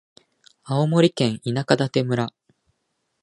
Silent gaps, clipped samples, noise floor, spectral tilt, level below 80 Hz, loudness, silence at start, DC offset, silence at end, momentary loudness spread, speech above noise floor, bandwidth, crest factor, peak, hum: none; under 0.1%; -74 dBFS; -6.5 dB/octave; -62 dBFS; -22 LUFS; 0.65 s; under 0.1%; 0.95 s; 8 LU; 54 dB; 11.5 kHz; 22 dB; 0 dBFS; none